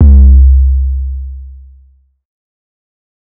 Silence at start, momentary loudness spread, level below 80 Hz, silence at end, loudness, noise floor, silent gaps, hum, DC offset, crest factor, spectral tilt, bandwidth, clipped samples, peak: 0 s; 21 LU; -10 dBFS; 1.75 s; -9 LUFS; -46 dBFS; none; none; under 0.1%; 10 dB; -14.5 dB/octave; 0.8 kHz; under 0.1%; 0 dBFS